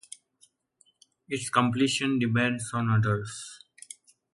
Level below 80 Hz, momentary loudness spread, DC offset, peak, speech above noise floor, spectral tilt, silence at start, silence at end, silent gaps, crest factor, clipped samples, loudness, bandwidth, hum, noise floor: -62 dBFS; 22 LU; under 0.1%; -8 dBFS; 41 dB; -5 dB/octave; 1.3 s; 0.8 s; none; 20 dB; under 0.1%; -27 LUFS; 11.5 kHz; none; -67 dBFS